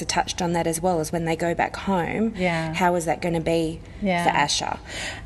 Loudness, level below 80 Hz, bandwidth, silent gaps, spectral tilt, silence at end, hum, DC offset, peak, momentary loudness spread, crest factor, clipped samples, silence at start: -24 LUFS; -44 dBFS; 13 kHz; none; -4.5 dB/octave; 0 s; none; under 0.1%; -6 dBFS; 5 LU; 18 dB; under 0.1%; 0 s